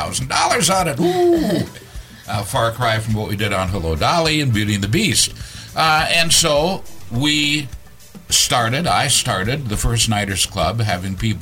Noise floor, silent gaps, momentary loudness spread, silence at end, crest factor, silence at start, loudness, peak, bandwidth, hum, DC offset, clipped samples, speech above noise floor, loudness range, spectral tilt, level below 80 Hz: -41 dBFS; none; 10 LU; 0 s; 18 dB; 0 s; -17 LUFS; 0 dBFS; 16.5 kHz; none; under 0.1%; under 0.1%; 24 dB; 3 LU; -3.5 dB/octave; -34 dBFS